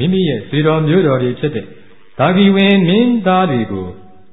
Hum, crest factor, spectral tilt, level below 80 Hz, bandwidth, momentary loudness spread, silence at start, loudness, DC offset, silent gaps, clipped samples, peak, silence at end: none; 14 dB; -10 dB/octave; -46 dBFS; 4 kHz; 11 LU; 0 s; -13 LUFS; 1%; none; under 0.1%; 0 dBFS; 0.35 s